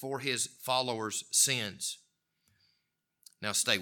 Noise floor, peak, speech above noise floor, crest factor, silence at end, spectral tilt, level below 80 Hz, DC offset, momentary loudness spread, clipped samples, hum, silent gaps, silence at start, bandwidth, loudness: -81 dBFS; -10 dBFS; 49 dB; 24 dB; 0 s; -1 dB/octave; -82 dBFS; under 0.1%; 12 LU; under 0.1%; none; none; 0 s; 19 kHz; -30 LUFS